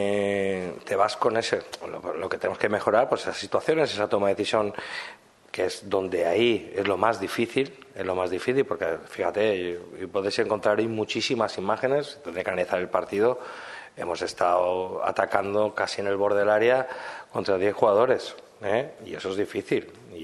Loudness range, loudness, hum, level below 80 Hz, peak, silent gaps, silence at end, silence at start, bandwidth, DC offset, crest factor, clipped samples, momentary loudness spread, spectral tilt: 3 LU; -26 LUFS; none; -68 dBFS; -4 dBFS; none; 0 s; 0 s; 12.5 kHz; under 0.1%; 22 dB; under 0.1%; 11 LU; -4.5 dB/octave